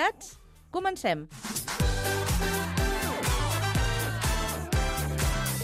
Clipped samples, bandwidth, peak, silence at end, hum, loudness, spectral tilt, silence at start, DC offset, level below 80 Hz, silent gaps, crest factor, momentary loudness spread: under 0.1%; 16 kHz; -12 dBFS; 0 s; none; -29 LUFS; -4 dB/octave; 0 s; under 0.1%; -34 dBFS; none; 16 dB; 6 LU